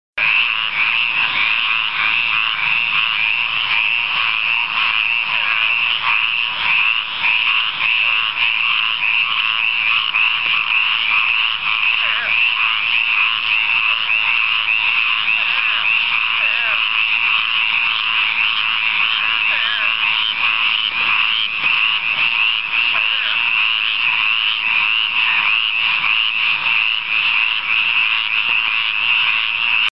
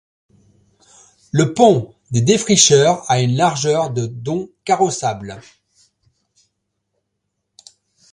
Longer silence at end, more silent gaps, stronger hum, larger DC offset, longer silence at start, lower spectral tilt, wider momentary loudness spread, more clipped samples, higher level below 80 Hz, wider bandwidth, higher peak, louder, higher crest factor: second, 0 s vs 2.75 s; neither; neither; first, 0.9% vs under 0.1%; second, 0.15 s vs 1.35 s; second, -1.5 dB/octave vs -4 dB/octave; second, 2 LU vs 14 LU; neither; about the same, -56 dBFS vs -54 dBFS; second, 8.8 kHz vs 11.5 kHz; second, -4 dBFS vs 0 dBFS; about the same, -14 LUFS vs -16 LUFS; second, 12 dB vs 18 dB